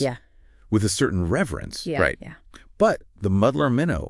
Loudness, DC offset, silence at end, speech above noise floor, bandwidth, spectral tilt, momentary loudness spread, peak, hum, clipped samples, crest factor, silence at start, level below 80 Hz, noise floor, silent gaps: -23 LUFS; under 0.1%; 0 s; 30 dB; 12 kHz; -5.5 dB/octave; 10 LU; -4 dBFS; none; under 0.1%; 18 dB; 0 s; -44 dBFS; -52 dBFS; none